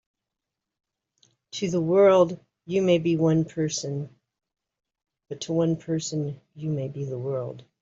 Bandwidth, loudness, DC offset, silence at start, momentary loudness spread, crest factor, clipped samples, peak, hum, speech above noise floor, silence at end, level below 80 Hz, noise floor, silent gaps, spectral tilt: 7.8 kHz; -25 LUFS; under 0.1%; 1.55 s; 17 LU; 18 dB; under 0.1%; -8 dBFS; none; 62 dB; 0.2 s; -66 dBFS; -86 dBFS; none; -6 dB/octave